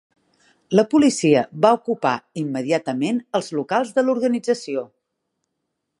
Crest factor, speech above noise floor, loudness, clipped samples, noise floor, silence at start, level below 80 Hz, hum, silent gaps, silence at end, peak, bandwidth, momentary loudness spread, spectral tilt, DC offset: 20 dB; 58 dB; -20 LUFS; under 0.1%; -77 dBFS; 0.7 s; -68 dBFS; none; none; 1.15 s; -2 dBFS; 11.5 kHz; 9 LU; -5.5 dB/octave; under 0.1%